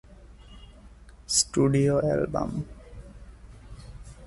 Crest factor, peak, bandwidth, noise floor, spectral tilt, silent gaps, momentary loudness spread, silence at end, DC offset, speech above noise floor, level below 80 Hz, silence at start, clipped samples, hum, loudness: 22 dB; -8 dBFS; 12 kHz; -49 dBFS; -4.5 dB/octave; none; 25 LU; 0 s; under 0.1%; 25 dB; -46 dBFS; 0.1 s; under 0.1%; none; -25 LUFS